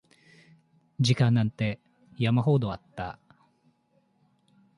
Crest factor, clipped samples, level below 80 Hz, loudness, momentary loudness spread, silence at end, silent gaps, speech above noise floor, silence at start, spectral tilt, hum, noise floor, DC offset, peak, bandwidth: 20 dB; under 0.1%; -58 dBFS; -27 LUFS; 15 LU; 1.65 s; none; 44 dB; 1 s; -6.5 dB/octave; none; -69 dBFS; under 0.1%; -10 dBFS; 11 kHz